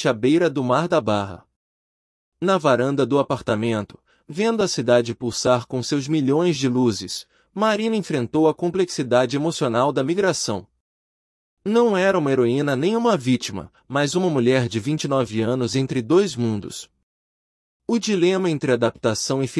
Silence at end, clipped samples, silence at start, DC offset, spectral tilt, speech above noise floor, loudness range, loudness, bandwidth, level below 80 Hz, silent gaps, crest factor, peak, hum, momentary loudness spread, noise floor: 0 s; under 0.1%; 0 s; under 0.1%; -5.5 dB/octave; over 70 dB; 2 LU; -21 LUFS; 12 kHz; -60 dBFS; 1.56-2.32 s, 10.80-11.57 s, 17.03-17.80 s; 18 dB; -4 dBFS; none; 8 LU; under -90 dBFS